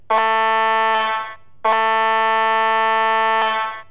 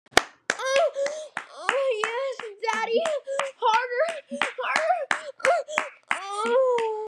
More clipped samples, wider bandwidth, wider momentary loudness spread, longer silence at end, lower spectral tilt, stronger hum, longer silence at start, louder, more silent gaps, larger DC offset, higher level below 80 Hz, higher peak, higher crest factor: neither; second, 4 kHz vs 13.5 kHz; about the same, 6 LU vs 7 LU; about the same, 0.1 s vs 0 s; first, -5 dB/octave vs -1 dB/octave; neither; about the same, 0.1 s vs 0.15 s; first, -17 LUFS vs -26 LUFS; neither; first, 0.8% vs under 0.1%; about the same, -64 dBFS vs -62 dBFS; second, -6 dBFS vs -2 dBFS; second, 10 dB vs 22 dB